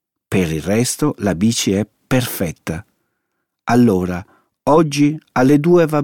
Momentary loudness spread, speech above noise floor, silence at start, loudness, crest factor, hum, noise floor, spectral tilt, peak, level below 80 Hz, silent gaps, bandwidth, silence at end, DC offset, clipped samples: 11 LU; 59 dB; 0.3 s; -16 LUFS; 14 dB; none; -74 dBFS; -5.5 dB/octave; -2 dBFS; -44 dBFS; none; 19 kHz; 0 s; under 0.1%; under 0.1%